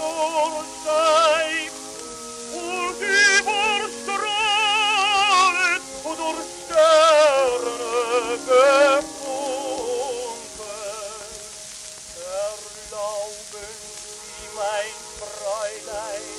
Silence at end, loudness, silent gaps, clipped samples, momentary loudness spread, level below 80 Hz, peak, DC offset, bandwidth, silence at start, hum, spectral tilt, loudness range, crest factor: 0 s; -20 LUFS; none; under 0.1%; 19 LU; -58 dBFS; -4 dBFS; under 0.1%; 13.5 kHz; 0 s; none; -0.5 dB/octave; 13 LU; 18 dB